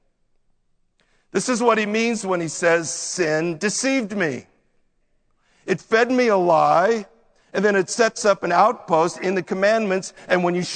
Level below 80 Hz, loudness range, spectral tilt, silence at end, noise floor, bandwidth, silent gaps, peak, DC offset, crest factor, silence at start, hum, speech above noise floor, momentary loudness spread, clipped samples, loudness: -66 dBFS; 4 LU; -4 dB/octave; 0 s; -64 dBFS; 9.4 kHz; none; -2 dBFS; under 0.1%; 20 dB; 1.35 s; none; 45 dB; 8 LU; under 0.1%; -20 LUFS